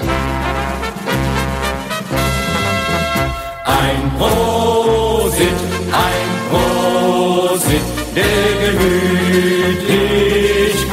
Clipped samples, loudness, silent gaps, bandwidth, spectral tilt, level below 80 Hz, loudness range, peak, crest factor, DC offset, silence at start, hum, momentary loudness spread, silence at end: under 0.1%; -15 LUFS; none; 16.5 kHz; -4.5 dB/octave; -28 dBFS; 3 LU; -2 dBFS; 14 dB; under 0.1%; 0 s; none; 6 LU; 0 s